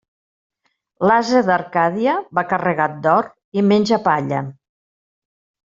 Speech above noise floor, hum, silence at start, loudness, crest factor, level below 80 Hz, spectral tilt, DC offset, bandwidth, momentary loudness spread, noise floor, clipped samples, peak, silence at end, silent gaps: over 73 dB; none; 1 s; -18 LUFS; 18 dB; -60 dBFS; -6.5 dB/octave; under 0.1%; 7.6 kHz; 7 LU; under -90 dBFS; under 0.1%; -2 dBFS; 1.15 s; 3.44-3.52 s